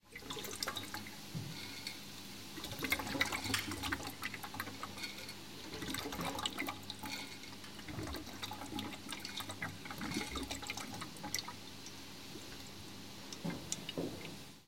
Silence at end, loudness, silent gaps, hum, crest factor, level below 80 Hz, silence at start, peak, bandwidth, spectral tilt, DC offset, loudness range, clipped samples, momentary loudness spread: 0 s; -42 LUFS; none; none; 26 dB; -62 dBFS; 0 s; -18 dBFS; 17 kHz; -3 dB/octave; 0.2%; 5 LU; under 0.1%; 12 LU